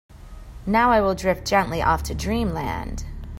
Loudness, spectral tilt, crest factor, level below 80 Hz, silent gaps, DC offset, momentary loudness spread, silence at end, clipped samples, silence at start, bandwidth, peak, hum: -22 LUFS; -5.5 dB/octave; 18 dB; -34 dBFS; none; under 0.1%; 14 LU; 0 s; under 0.1%; 0.1 s; 16 kHz; -4 dBFS; none